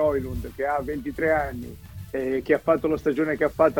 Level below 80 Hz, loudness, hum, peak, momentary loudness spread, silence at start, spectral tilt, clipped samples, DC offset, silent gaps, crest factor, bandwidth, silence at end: -44 dBFS; -25 LUFS; none; -6 dBFS; 12 LU; 0 s; -7.5 dB/octave; under 0.1%; under 0.1%; none; 18 dB; 19 kHz; 0 s